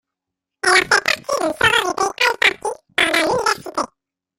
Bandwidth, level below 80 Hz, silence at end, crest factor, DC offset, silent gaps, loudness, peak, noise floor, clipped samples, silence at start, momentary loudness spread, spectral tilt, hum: 16.5 kHz; -54 dBFS; 0.5 s; 20 dB; under 0.1%; none; -17 LUFS; 0 dBFS; -83 dBFS; under 0.1%; 0.65 s; 10 LU; -1.5 dB/octave; none